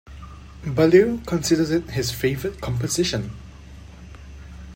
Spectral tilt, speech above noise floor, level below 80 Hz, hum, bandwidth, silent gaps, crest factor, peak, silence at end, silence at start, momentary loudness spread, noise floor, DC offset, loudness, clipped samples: -5 dB/octave; 21 dB; -42 dBFS; none; 16.5 kHz; none; 20 dB; -2 dBFS; 0 s; 0.1 s; 26 LU; -41 dBFS; under 0.1%; -21 LUFS; under 0.1%